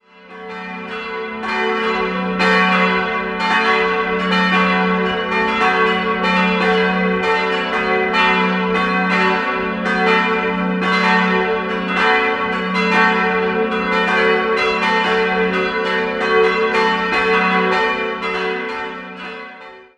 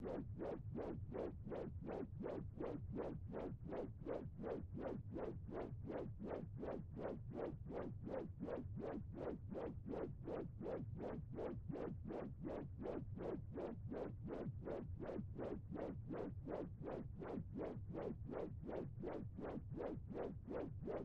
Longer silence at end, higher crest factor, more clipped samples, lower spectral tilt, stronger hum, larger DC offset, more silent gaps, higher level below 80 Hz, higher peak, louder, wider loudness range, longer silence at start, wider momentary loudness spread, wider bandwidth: first, 0.15 s vs 0 s; about the same, 16 dB vs 16 dB; neither; second, -5.5 dB/octave vs -10 dB/octave; neither; neither; neither; first, -48 dBFS vs -60 dBFS; first, -2 dBFS vs -34 dBFS; first, -16 LUFS vs -49 LUFS; about the same, 1 LU vs 0 LU; first, 0.25 s vs 0 s; first, 10 LU vs 1 LU; first, 10.5 kHz vs 7.4 kHz